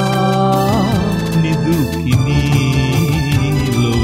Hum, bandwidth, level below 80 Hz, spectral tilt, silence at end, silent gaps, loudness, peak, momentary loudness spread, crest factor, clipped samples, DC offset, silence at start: none; 16.5 kHz; -28 dBFS; -6.5 dB/octave; 0 s; none; -15 LUFS; -2 dBFS; 2 LU; 12 dB; under 0.1%; under 0.1%; 0 s